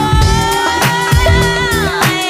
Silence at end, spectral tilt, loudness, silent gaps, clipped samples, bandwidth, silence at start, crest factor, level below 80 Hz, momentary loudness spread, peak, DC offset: 0 s; -4 dB/octave; -12 LUFS; none; under 0.1%; 16 kHz; 0 s; 12 dB; -18 dBFS; 2 LU; 0 dBFS; under 0.1%